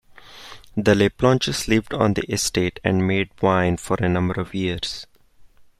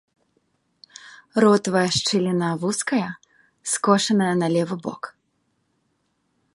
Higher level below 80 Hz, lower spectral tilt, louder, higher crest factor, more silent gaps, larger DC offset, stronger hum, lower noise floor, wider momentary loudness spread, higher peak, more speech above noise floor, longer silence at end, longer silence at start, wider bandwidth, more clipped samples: first, -44 dBFS vs -62 dBFS; about the same, -5 dB/octave vs -4.5 dB/octave; about the same, -21 LUFS vs -21 LUFS; about the same, 18 dB vs 22 dB; neither; neither; neither; second, -50 dBFS vs -70 dBFS; second, 11 LU vs 18 LU; about the same, -4 dBFS vs -2 dBFS; second, 30 dB vs 50 dB; second, 0.35 s vs 1.45 s; second, 0.3 s vs 1.05 s; first, 14.5 kHz vs 11.5 kHz; neither